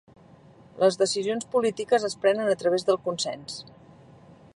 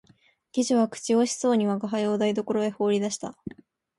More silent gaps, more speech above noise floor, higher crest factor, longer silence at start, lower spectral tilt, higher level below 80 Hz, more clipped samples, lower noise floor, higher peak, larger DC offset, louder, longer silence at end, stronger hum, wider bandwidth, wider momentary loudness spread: neither; second, 28 dB vs 37 dB; about the same, 18 dB vs 14 dB; first, 0.75 s vs 0.55 s; second, -3.5 dB/octave vs -5 dB/octave; about the same, -68 dBFS vs -68 dBFS; neither; second, -52 dBFS vs -61 dBFS; first, -8 dBFS vs -12 dBFS; neither; about the same, -25 LUFS vs -25 LUFS; first, 0.95 s vs 0.5 s; neither; about the same, 11.5 kHz vs 11.5 kHz; about the same, 8 LU vs 10 LU